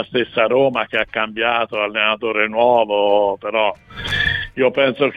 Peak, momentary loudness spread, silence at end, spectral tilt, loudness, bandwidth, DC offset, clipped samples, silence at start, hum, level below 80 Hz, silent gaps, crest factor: -2 dBFS; 5 LU; 0 s; -5.5 dB/octave; -17 LUFS; 9.8 kHz; under 0.1%; under 0.1%; 0 s; none; -44 dBFS; none; 16 dB